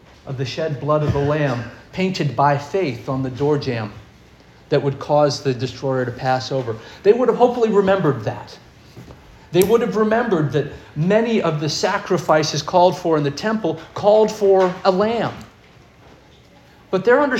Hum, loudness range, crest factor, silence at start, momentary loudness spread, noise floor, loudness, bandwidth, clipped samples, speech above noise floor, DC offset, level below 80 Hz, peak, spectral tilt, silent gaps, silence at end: none; 4 LU; 18 dB; 0.25 s; 10 LU; -48 dBFS; -19 LUFS; 17 kHz; under 0.1%; 30 dB; under 0.1%; -50 dBFS; -2 dBFS; -6 dB/octave; none; 0 s